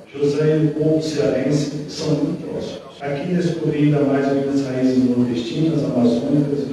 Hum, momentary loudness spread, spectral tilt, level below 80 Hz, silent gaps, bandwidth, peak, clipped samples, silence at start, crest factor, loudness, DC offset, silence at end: none; 9 LU; -7.5 dB/octave; -54 dBFS; none; 11.5 kHz; -6 dBFS; under 0.1%; 0 s; 14 dB; -19 LUFS; under 0.1%; 0 s